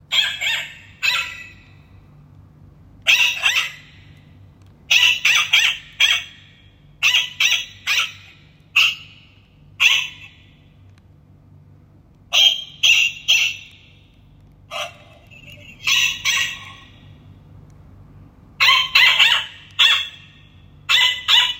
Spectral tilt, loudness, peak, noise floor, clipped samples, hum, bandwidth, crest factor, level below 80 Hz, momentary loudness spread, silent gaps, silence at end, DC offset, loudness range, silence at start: 1.5 dB/octave; -15 LUFS; 0 dBFS; -49 dBFS; under 0.1%; none; 16.5 kHz; 20 dB; -56 dBFS; 16 LU; none; 0 s; under 0.1%; 7 LU; 0.1 s